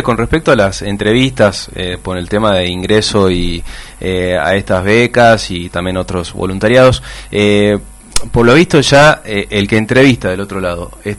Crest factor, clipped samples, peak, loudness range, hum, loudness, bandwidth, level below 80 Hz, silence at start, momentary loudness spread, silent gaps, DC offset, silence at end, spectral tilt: 12 dB; 0.4%; 0 dBFS; 4 LU; none; -12 LUFS; 12 kHz; -30 dBFS; 0 s; 12 LU; none; under 0.1%; 0 s; -5 dB/octave